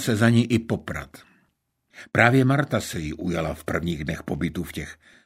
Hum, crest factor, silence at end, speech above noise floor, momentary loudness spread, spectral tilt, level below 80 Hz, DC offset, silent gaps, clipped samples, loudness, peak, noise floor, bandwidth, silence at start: none; 22 dB; 0.3 s; 47 dB; 16 LU; -6 dB/octave; -46 dBFS; under 0.1%; none; under 0.1%; -24 LUFS; -2 dBFS; -71 dBFS; 16 kHz; 0 s